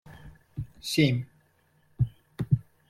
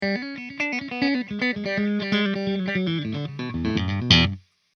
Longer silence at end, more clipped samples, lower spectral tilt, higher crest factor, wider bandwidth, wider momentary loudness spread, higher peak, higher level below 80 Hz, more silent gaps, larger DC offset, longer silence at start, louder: about the same, 0.3 s vs 0.4 s; neither; about the same, -6 dB/octave vs -5.5 dB/octave; about the same, 22 dB vs 24 dB; first, 15 kHz vs 6.8 kHz; first, 19 LU vs 12 LU; second, -10 dBFS vs 0 dBFS; second, -52 dBFS vs -46 dBFS; neither; neither; about the same, 0.1 s vs 0 s; second, -29 LUFS vs -24 LUFS